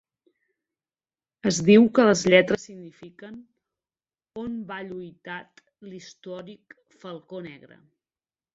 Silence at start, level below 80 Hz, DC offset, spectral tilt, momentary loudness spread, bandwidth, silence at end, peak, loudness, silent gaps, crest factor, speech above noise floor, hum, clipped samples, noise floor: 1.45 s; -64 dBFS; under 0.1%; -5 dB/octave; 27 LU; 8 kHz; 1 s; -2 dBFS; -20 LUFS; none; 24 dB; over 66 dB; none; under 0.1%; under -90 dBFS